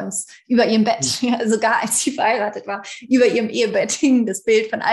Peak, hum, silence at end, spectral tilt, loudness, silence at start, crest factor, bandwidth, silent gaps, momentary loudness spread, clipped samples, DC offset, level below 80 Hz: -4 dBFS; none; 0 s; -3 dB/octave; -18 LUFS; 0 s; 14 dB; 12.5 kHz; none; 9 LU; under 0.1%; under 0.1%; -62 dBFS